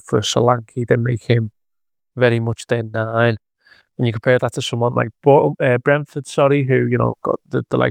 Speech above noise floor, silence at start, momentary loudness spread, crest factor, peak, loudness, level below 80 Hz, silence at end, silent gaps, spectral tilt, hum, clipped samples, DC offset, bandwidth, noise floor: 68 dB; 0.1 s; 8 LU; 18 dB; 0 dBFS; -18 LUFS; -54 dBFS; 0 s; none; -6 dB/octave; none; under 0.1%; under 0.1%; 10.5 kHz; -85 dBFS